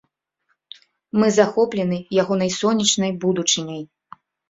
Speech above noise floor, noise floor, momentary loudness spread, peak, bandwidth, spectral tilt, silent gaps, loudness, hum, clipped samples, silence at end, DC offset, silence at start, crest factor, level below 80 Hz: 52 dB; -71 dBFS; 8 LU; -2 dBFS; 8 kHz; -4 dB/octave; none; -19 LUFS; none; under 0.1%; 0.65 s; under 0.1%; 1.15 s; 20 dB; -60 dBFS